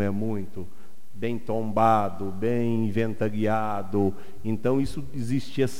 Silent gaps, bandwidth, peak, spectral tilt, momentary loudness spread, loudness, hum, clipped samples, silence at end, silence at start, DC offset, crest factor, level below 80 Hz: none; 16 kHz; -8 dBFS; -7.5 dB/octave; 12 LU; -27 LUFS; none; under 0.1%; 0 s; 0 s; 4%; 18 dB; -52 dBFS